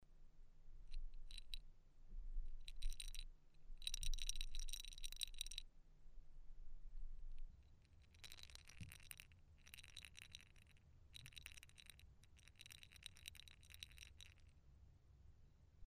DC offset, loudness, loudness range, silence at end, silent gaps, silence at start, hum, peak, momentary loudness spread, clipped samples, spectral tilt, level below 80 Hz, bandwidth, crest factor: under 0.1%; -56 LUFS; 10 LU; 0 s; none; 0 s; none; -24 dBFS; 18 LU; under 0.1%; -1 dB/octave; -54 dBFS; 15.5 kHz; 26 dB